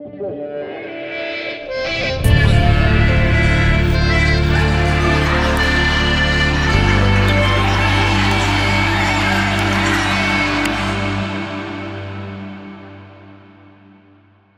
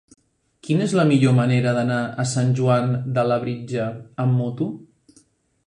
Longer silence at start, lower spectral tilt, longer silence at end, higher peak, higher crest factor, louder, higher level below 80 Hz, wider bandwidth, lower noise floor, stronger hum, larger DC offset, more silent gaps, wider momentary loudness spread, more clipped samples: second, 0 s vs 0.65 s; second, -5.5 dB/octave vs -7 dB/octave; first, 1.2 s vs 0.85 s; first, 0 dBFS vs -6 dBFS; about the same, 16 dB vs 16 dB; first, -15 LUFS vs -21 LUFS; first, -22 dBFS vs -60 dBFS; first, 14.5 kHz vs 10.5 kHz; second, -50 dBFS vs -58 dBFS; neither; neither; neither; about the same, 13 LU vs 11 LU; neither